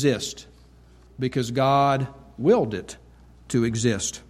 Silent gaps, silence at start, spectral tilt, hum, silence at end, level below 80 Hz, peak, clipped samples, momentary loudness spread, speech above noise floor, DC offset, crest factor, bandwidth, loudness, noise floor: none; 0 s; -5 dB/octave; none; 0.1 s; -52 dBFS; -8 dBFS; under 0.1%; 14 LU; 29 dB; under 0.1%; 16 dB; 14.5 kHz; -24 LUFS; -51 dBFS